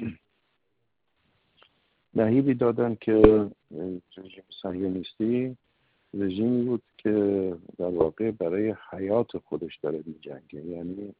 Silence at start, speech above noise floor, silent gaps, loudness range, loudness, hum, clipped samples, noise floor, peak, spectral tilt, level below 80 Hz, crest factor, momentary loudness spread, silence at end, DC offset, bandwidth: 0 s; 52 dB; none; 6 LU; -26 LUFS; none; under 0.1%; -78 dBFS; -4 dBFS; -7.5 dB/octave; -46 dBFS; 24 dB; 17 LU; 0.1 s; under 0.1%; 4.8 kHz